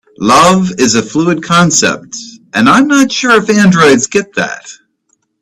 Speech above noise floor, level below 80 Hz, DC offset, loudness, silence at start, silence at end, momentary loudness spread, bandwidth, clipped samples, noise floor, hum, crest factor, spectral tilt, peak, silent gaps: 51 dB; -46 dBFS; under 0.1%; -9 LUFS; 0.2 s; 0.7 s; 12 LU; 14 kHz; 0.2%; -60 dBFS; none; 10 dB; -4 dB/octave; 0 dBFS; none